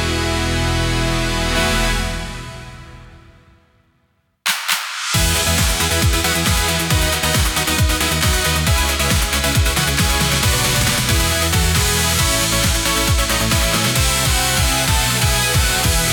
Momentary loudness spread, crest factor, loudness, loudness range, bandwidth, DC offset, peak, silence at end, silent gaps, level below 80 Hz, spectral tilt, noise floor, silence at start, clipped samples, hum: 4 LU; 16 dB; -16 LUFS; 7 LU; 19 kHz; under 0.1%; 0 dBFS; 0 s; none; -24 dBFS; -3 dB/octave; -63 dBFS; 0 s; under 0.1%; none